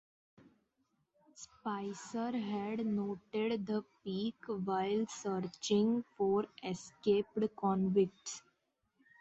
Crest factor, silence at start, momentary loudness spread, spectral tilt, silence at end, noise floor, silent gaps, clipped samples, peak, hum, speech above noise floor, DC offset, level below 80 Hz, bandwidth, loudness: 18 dB; 1.35 s; 11 LU; -6 dB/octave; 0.8 s; -81 dBFS; none; under 0.1%; -20 dBFS; none; 45 dB; under 0.1%; -74 dBFS; 8 kHz; -36 LUFS